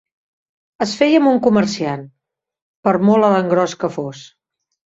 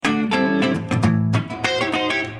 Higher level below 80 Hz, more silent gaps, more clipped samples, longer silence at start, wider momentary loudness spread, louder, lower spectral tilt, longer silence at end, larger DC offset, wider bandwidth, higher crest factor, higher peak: second, -60 dBFS vs -52 dBFS; first, 2.62-2.83 s vs none; neither; first, 0.8 s vs 0.05 s; first, 11 LU vs 3 LU; first, -16 LUFS vs -20 LUFS; about the same, -6 dB/octave vs -6 dB/octave; first, 0.6 s vs 0 s; neither; second, 8 kHz vs 11.5 kHz; about the same, 16 dB vs 16 dB; about the same, -2 dBFS vs -4 dBFS